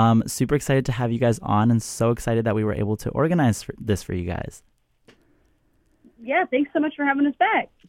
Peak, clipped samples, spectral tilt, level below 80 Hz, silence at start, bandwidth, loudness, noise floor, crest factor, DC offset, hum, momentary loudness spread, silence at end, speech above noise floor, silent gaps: -6 dBFS; under 0.1%; -6.5 dB/octave; -46 dBFS; 0 s; 16.5 kHz; -22 LUFS; -63 dBFS; 16 dB; under 0.1%; none; 8 LU; 0.25 s; 41 dB; none